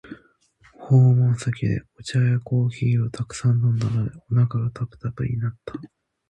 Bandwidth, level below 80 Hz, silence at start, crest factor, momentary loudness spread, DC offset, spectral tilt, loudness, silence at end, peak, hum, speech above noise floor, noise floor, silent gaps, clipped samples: 9.4 kHz; -50 dBFS; 0.05 s; 14 dB; 12 LU; under 0.1%; -7.5 dB/octave; -22 LUFS; 0.45 s; -8 dBFS; none; 36 dB; -57 dBFS; none; under 0.1%